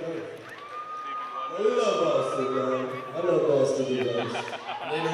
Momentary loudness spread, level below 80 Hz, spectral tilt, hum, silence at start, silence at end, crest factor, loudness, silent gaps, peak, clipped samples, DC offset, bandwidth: 13 LU; -74 dBFS; -5 dB/octave; none; 0 s; 0 s; 18 dB; -27 LUFS; none; -10 dBFS; under 0.1%; under 0.1%; 12 kHz